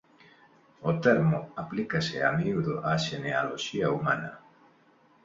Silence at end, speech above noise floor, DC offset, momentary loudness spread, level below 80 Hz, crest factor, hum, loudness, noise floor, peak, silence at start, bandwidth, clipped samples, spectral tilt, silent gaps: 0.85 s; 34 dB; under 0.1%; 9 LU; -62 dBFS; 22 dB; none; -28 LUFS; -62 dBFS; -8 dBFS; 0.8 s; 7.8 kHz; under 0.1%; -6 dB/octave; none